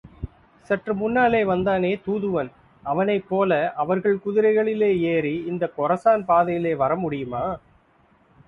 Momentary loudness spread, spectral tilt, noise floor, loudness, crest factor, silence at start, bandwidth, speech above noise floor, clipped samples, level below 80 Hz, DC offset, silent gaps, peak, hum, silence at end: 9 LU; -8.5 dB/octave; -59 dBFS; -22 LUFS; 16 dB; 0.05 s; 4.8 kHz; 37 dB; under 0.1%; -52 dBFS; under 0.1%; none; -6 dBFS; none; 0.9 s